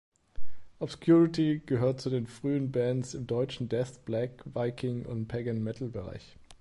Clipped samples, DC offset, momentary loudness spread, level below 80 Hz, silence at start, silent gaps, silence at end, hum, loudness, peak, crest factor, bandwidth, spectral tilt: under 0.1%; under 0.1%; 13 LU; -56 dBFS; 0.1 s; none; 0.05 s; none; -31 LUFS; -12 dBFS; 16 dB; 11.5 kHz; -7.5 dB/octave